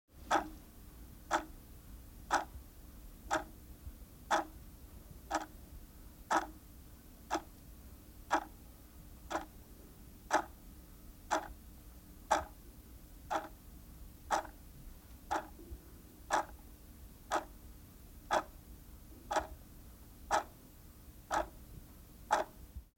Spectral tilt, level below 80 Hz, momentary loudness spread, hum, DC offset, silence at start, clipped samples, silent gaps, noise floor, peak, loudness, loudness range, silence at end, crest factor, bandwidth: -3.5 dB/octave; -56 dBFS; 20 LU; none; under 0.1%; 0.15 s; under 0.1%; none; -56 dBFS; -16 dBFS; -38 LUFS; 2 LU; 0.15 s; 26 dB; 17 kHz